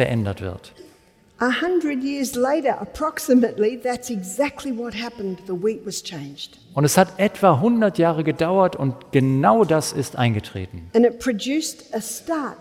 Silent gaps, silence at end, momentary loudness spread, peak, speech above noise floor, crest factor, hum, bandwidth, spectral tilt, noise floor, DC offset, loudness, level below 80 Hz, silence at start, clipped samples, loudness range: none; 0.05 s; 12 LU; -2 dBFS; 33 dB; 18 dB; none; 16.5 kHz; -5.5 dB/octave; -54 dBFS; under 0.1%; -21 LUFS; -54 dBFS; 0 s; under 0.1%; 5 LU